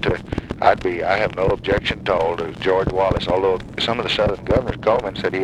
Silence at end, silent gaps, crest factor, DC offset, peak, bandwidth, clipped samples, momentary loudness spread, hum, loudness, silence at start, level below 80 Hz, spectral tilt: 0 s; none; 18 dB; under 0.1%; 0 dBFS; 11 kHz; under 0.1%; 4 LU; none; -20 LUFS; 0 s; -36 dBFS; -6 dB/octave